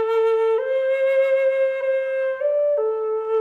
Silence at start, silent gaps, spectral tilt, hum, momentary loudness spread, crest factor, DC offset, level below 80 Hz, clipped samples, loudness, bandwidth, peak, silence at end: 0 s; none; -2.5 dB/octave; none; 4 LU; 8 dB; under 0.1%; -74 dBFS; under 0.1%; -21 LUFS; 4.3 kHz; -12 dBFS; 0 s